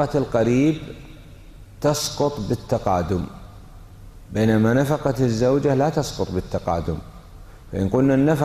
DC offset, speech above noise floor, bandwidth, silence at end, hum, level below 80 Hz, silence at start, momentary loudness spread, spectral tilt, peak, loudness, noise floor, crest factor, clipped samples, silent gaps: under 0.1%; 22 dB; 15 kHz; 0 s; none; -42 dBFS; 0 s; 12 LU; -6.5 dB/octave; -6 dBFS; -21 LUFS; -42 dBFS; 14 dB; under 0.1%; none